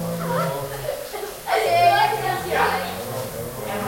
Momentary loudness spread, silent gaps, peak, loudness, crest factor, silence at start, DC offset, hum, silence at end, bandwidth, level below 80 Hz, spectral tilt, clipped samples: 13 LU; none; -4 dBFS; -22 LUFS; 18 dB; 0 s; under 0.1%; none; 0 s; 16.5 kHz; -50 dBFS; -4 dB/octave; under 0.1%